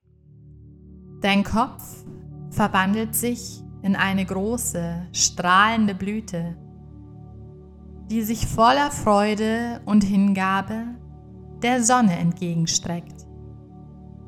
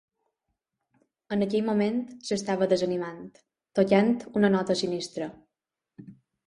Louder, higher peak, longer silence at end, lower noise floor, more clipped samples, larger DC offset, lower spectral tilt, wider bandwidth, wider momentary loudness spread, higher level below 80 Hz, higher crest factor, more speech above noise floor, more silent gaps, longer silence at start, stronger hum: first, -22 LUFS vs -26 LUFS; first, -2 dBFS vs -8 dBFS; second, 0 s vs 0.35 s; second, -50 dBFS vs -87 dBFS; neither; neither; second, -4 dB/octave vs -6 dB/octave; first, 17 kHz vs 11 kHz; first, 25 LU vs 13 LU; first, -44 dBFS vs -68 dBFS; about the same, 20 dB vs 20 dB; second, 28 dB vs 61 dB; neither; second, 0.45 s vs 1.3 s; neither